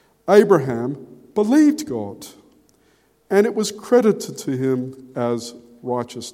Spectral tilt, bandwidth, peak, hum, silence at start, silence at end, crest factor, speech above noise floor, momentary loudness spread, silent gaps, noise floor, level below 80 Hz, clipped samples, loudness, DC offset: -6 dB/octave; 16 kHz; 0 dBFS; none; 0.25 s; 0.05 s; 20 dB; 41 dB; 17 LU; none; -59 dBFS; -64 dBFS; under 0.1%; -19 LUFS; under 0.1%